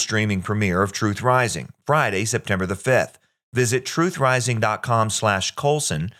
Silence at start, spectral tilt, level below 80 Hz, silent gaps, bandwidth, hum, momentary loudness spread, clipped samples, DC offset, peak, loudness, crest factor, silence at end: 0 s; -4.5 dB/octave; -58 dBFS; 3.43-3.52 s; 15.5 kHz; none; 4 LU; under 0.1%; under 0.1%; -4 dBFS; -21 LUFS; 18 dB; 0.1 s